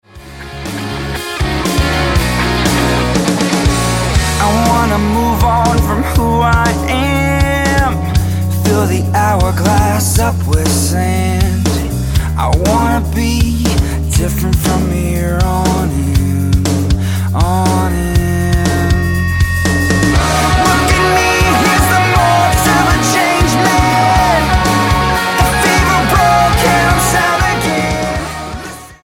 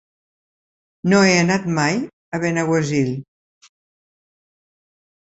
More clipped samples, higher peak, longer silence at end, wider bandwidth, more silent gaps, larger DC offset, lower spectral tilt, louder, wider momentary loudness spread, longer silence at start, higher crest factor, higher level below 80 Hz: neither; about the same, 0 dBFS vs -2 dBFS; second, 0.1 s vs 2.15 s; first, 17.5 kHz vs 8.2 kHz; second, none vs 2.13-2.32 s; neither; about the same, -5 dB/octave vs -5 dB/octave; first, -12 LUFS vs -18 LUFS; second, 5 LU vs 12 LU; second, 0.15 s vs 1.05 s; second, 12 dB vs 20 dB; first, -20 dBFS vs -58 dBFS